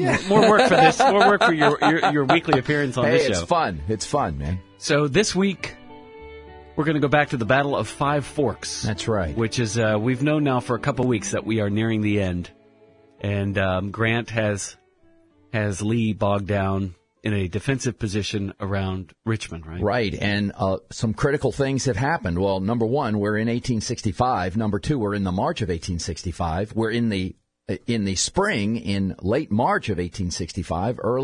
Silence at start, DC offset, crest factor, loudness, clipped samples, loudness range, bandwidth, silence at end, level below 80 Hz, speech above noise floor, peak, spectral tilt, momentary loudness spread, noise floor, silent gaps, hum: 0 s; under 0.1%; 22 dB; -22 LUFS; under 0.1%; 6 LU; 11 kHz; 0 s; -46 dBFS; 35 dB; 0 dBFS; -5.5 dB/octave; 10 LU; -57 dBFS; none; none